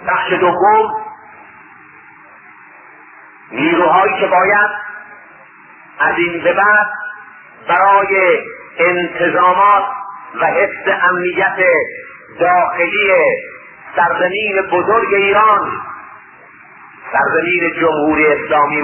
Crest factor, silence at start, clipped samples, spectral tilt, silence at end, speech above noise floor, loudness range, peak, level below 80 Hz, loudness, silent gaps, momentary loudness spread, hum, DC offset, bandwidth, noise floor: 14 dB; 0 s; under 0.1%; -9.5 dB/octave; 0 s; 28 dB; 4 LU; 0 dBFS; -54 dBFS; -13 LUFS; none; 17 LU; none; under 0.1%; 3.3 kHz; -41 dBFS